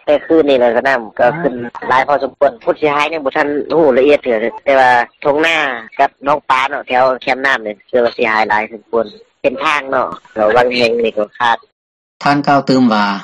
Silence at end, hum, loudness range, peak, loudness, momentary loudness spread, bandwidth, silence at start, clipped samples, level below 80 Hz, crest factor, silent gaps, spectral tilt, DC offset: 0 s; none; 2 LU; 0 dBFS; -13 LUFS; 8 LU; 11 kHz; 0.05 s; under 0.1%; -52 dBFS; 14 dB; 11.72-12.20 s; -5.5 dB/octave; under 0.1%